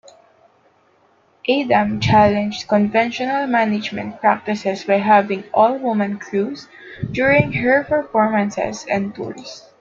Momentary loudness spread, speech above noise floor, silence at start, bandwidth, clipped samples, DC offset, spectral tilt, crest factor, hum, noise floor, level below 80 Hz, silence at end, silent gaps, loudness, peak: 12 LU; 39 dB; 1.45 s; 7.6 kHz; under 0.1%; under 0.1%; -6 dB/octave; 16 dB; none; -57 dBFS; -50 dBFS; 0.2 s; none; -18 LUFS; -2 dBFS